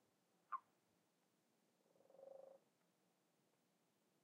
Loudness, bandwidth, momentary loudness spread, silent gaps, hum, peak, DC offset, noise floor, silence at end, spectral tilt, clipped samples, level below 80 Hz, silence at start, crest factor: -58 LUFS; 9.4 kHz; 12 LU; none; none; -36 dBFS; under 0.1%; -83 dBFS; 1.65 s; -4 dB/octave; under 0.1%; under -90 dBFS; 0.5 s; 28 dB